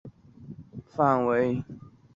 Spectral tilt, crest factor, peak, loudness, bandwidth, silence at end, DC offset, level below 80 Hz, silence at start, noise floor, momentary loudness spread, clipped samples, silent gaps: -9 dB/octave; 20 dB; -8 dBFS; -25 LUFS; 7.4 kHz; 0.35 s; under 0.1%; -60 dBFS; 0.05 s; -47 dBFS; 23 LU; under 0.1%; none